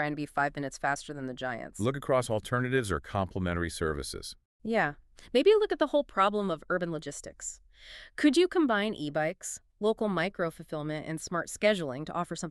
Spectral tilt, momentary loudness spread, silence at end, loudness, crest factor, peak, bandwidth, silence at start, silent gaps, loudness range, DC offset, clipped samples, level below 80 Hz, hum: -5 dB/octave; 13 LU; 0 s; -30 LUFS; 18 dB; -12 dBFS; 13.5 kHz; 0 s; 4.45-4.60 s; 3 LU; under 0.1%; under 0.1%; -54 dBFS; none